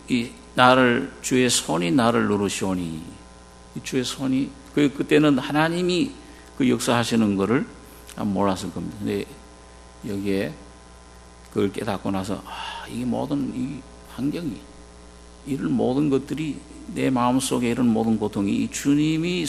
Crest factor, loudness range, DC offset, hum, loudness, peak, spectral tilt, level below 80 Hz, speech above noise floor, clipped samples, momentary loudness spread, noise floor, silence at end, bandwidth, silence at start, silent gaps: 24 dB; 8 LU; under 0.1%; none; -23 LUFS; 0 dBFS; -5 dB/octave; -48 dBFS; 23 dB; under 0.1%; 15 LU; -46 dBFS; 0 s; 13 kHz; 0 s; none